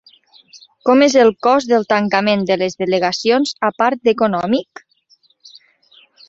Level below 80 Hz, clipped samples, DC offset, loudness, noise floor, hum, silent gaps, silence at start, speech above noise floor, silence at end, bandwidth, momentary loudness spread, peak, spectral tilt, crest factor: -60 dBFS; under 0.1%; under 0.1%; -15 LUFS; -56 dBFS; none; none; 0.55 s; 42 dB; 1.65 s; 8 kHz; 7 LU; -2 dBFS; -4.5 dB/octave; 16 dB